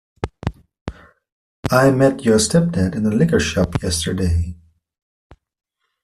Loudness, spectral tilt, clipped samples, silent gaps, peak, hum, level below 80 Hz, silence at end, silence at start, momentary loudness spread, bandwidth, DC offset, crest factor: -17 LUFS; -5.5 dB/octave; under 0.1%; 0.81-0.86 s, 1.32-1.63 s; -2 dBFS; none; -38 dBFS; 1.5 s; 0.25 s; 16 LU; 14 kHz; under 0.1%; 16 dB